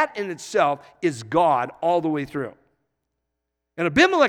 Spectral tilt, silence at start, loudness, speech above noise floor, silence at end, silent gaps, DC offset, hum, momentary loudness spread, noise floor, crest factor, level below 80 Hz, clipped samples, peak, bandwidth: -5 dB/octave; 0 s; -23 LUFS; 59 dB; 0 s; none; under 0.1%; none; 12 LU; -80 dBFS; 20 dB; -58 dBFS; under 0.1%; -2 dBFS; 13.5 kHz